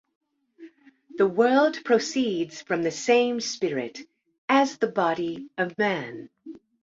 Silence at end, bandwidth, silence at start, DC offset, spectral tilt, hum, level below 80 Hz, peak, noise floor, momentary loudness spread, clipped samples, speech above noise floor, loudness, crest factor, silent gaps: 0.25 s; 7.8 kHz; 0.6 s; under 0.1%; -4 dB/octave; none; -72 dBFS; -6 dBFS; -51 dBFS; 19 LU; under 0.1%; 26 dB; -24 LUFS; 20 dB; 4.38-4.48 s